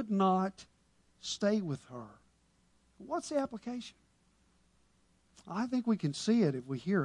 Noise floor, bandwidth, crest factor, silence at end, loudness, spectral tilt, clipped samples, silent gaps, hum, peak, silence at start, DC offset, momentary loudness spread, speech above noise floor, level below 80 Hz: -70 dBFS; 11 kHz; 18 dB; 0 s; -34 LUFS; -6 dB/octave; under 0.1%; none; none; -18 dBFS; 0 s; under 0.1%; 15 LU; 37 dB; -72 dBFS